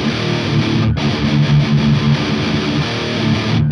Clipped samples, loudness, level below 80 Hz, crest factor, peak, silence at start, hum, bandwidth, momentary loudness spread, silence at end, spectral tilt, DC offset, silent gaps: under 0.1%; -15 LUFS; -34 dBFS; 12 dB; -2 dBFS; 0 s; none; 9.8 kHz; 4 LU; 0 s; -6.5 dB/octave; under 0.1%; none